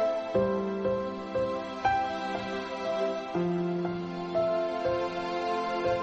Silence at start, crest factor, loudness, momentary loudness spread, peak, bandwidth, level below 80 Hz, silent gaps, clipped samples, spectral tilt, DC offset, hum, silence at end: 0 s; 16 dB; -30 LUFS; 5 LU; -14 dBFS; 8.4 kHz; -58 dBFS; none; under 0.1%; -6.5 dB/octave; under 0.1%; none; 0 s